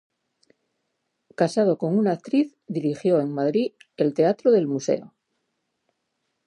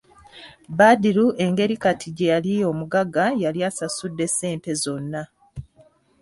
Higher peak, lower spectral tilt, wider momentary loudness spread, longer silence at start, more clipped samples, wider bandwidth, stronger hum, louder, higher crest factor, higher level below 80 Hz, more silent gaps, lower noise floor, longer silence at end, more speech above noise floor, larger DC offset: second, -8 dBFS vs -4 dBFS; first, -7 dB/octave vs -5 dB/octave; second, 8 LU vs 15 LU; first, 1.4 s vs 0.35 s; neither; about the same, 11 kHz vs 12 kHz; neither; about the same, -23 LUFS vs -21 LUFS; about the same, 16 dB vs 18 dB; second, -78 dBFS vs -56 dBFS; neither; first, -77 dBFS vs -56 dBFS; first, 1.4 s vs 0.6 s; first, 55 dB vs 35 dB; neither